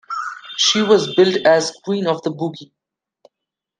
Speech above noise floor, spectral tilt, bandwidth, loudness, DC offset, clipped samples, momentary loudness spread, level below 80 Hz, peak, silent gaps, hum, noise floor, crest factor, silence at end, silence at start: 67 dB; -3.5 dB/octave; 9.6 kHz; -17 LUFS; under 0.1%; under 0.1%; 13 LU; -68 dBFS; 0 dBFS; none; none; -83 dBFS; 18 dB; 1.15 s; 0.1 s